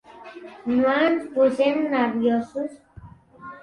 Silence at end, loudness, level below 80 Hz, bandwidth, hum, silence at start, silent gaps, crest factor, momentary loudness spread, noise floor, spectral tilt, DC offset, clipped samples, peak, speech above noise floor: 0.05 s; -22 LUFS; -60 dBFS; 10.5 kHz; none; 0.1 s; none; 16 dB; 22 LU; -46 dBFS; -6 dB/octave; under 0.1%; under 0.1%; -8 dBFS; 25 dB